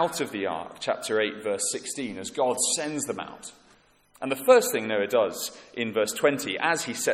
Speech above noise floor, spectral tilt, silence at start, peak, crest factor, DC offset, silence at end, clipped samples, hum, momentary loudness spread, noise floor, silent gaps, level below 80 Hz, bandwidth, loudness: 34 dB; -2.5 dB/octave; 0 s; -6 dBFS; 22 dB; under 0.1%; 0 s; under 0.1%; none; 13 LU; -60 dBFS; none; -70 dBFS; 16 kHz; -26 LUFS